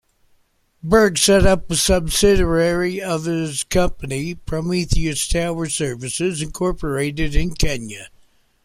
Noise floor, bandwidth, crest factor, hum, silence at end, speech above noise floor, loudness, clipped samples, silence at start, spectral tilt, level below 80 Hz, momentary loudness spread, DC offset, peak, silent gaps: -60 dBFS; 15.5 kHz; 18 dB; none; 0.55 s; 42 dB; -19 LUFS; under 0.1%; 0.85 s; -4 dB/octave; -28 dBFS; 11 LU; under 0.1%; -2 dBFS; none